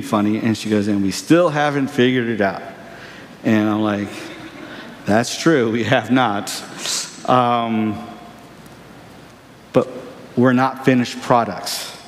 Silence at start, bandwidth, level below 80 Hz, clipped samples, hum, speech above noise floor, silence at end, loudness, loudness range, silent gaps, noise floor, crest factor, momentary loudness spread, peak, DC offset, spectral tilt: 0 s; 15.5 kHz; -60 dBFS; under 0.1%; none; 26 dB; 0 s; -18 LUFS; 4 LU; none; -43 dBFS; 18 dB; 18 LU; -2 dBFS; under 0.1%; -5 dB/octave